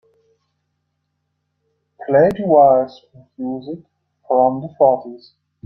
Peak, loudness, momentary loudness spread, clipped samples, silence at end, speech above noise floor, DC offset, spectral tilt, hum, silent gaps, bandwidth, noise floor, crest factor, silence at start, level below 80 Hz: -2 dBFS; -16 LUFS; 21 LU; under 0.1%; 0.5 s; 56 dB; under 0.1%; -9 dB/octave; none; none; 6 kHz; -72 dBFS; 18 dB; 2 s; -58 dBFS